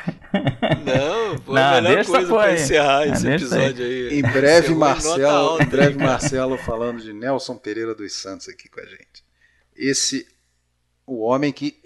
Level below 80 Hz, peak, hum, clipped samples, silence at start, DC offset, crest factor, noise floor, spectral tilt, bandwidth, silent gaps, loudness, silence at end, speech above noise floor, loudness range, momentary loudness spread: -46 dBFS; 0 dBFS; none; under 0.1%; 0 s; under 0.1%; 20 dB; -68 dBFS; -4.5 dB/octave; 12 kHz; none; -19 LUFS; 0.15 s; 49 dB; 10 LU; 14 LU